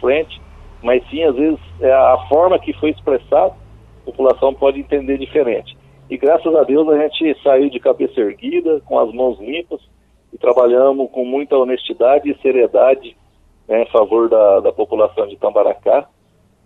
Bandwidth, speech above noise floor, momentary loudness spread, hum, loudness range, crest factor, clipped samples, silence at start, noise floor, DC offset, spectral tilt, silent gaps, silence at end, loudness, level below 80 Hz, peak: 4.1 kHz; 41 dB; 8 LU; none; 3 LU; 14 dB; under 0.1%; 0 s; -55 dBFS; under 0.1%; -7.5 dB/octave; none; 0.6 s; -15 LUFS; -44 dBFS; 0 dBFS